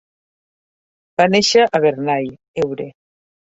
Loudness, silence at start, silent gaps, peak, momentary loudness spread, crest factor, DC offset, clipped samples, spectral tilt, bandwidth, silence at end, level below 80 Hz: -16 LUFS; 1.2 s; 2.48-2.54 s; -2 dBFS; 14 LU; 18 dB; under 0.1%; under 0.1%; -4 dB/octave; 8 kHz; 0.6 s; -60 dBFS